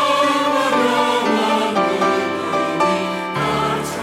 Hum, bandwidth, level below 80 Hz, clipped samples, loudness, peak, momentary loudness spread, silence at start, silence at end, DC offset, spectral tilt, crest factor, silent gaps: none; 16.5 kHz; -54 dBFS; under 0.1%; -18 LUFS; -6 dBFS; 5 LU; 0 s; 0 s; under 0.1%; -4 dB/octave; 12 dB; none